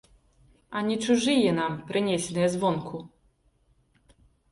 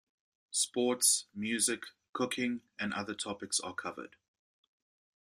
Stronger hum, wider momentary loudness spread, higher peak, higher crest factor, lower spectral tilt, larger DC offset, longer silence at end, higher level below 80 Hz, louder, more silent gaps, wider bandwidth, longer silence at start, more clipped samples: neither; about the same, 12 LU vs 14 LU; first, -10 dBFS vs -14 dBFS; about the same, 18 dB vs 22 dB; first, -5 dB/octave vs -1.5 dB/octave; neither; first, 1.45 s vs 1.2 s; first, -62 dBFS vs -78 dBFS; first, -26 LUFS vs -33 LUFS; second, none vs 2.09-2.13 s; second, 11.5 kHz vs 15.5 kHz; first, 0.7 s vs 0.5 s; neither